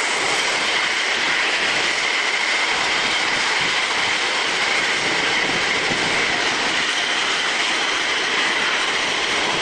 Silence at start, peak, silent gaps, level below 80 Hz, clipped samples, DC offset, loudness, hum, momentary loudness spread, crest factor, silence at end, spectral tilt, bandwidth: 0 s; -6 dBFS; none; -54 dBFS; under 0.1%; under 0.1%; -18 LUFS; none; 1 LU; 14 dB; 0 s; -0.5 dB/octave; 11.5 kHz